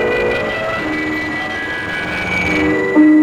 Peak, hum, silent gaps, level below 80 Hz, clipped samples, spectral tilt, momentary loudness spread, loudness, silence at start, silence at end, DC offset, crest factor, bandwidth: -2 dBFS; none; none; -40 dBFS; under 0.1%; -6 dB/octave; 8 LU; -16 LUFS; 0 s; 0 s; 0.2%; 14 dB; 10.5 kHz